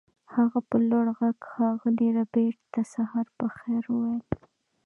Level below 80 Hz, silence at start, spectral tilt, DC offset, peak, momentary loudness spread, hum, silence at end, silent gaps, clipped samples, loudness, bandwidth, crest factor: -62 dBFS; 0.3 s; -9 dB/octave; under 0.1%; -12 dBFS; 8 LU; none; 0.5 s; none; under 0.1%; -27 LUFS; 7.2 kHz; 16 dB